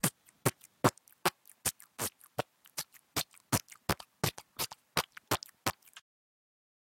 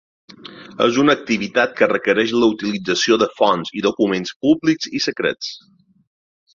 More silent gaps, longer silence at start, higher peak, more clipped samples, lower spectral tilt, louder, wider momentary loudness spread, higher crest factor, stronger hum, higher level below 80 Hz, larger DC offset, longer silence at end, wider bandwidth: second, none vs 4.36-4.40 s; second, 0.05 s vs 0.45 s; second, -10 dBFS vs 0 dBFS; neither; about the same, -3 dB/octave vs -4 dB/octave; second, -36 LUFS vs -18 LUFS; about the same, 9 LU vs 11 LU; first, 28 dB vs 18 dB; neither; second, -64 dBFS vs -58 dBFS; neither; about the same, 1 s vs 1 s; first, 17 kHz vs 7.4 kHz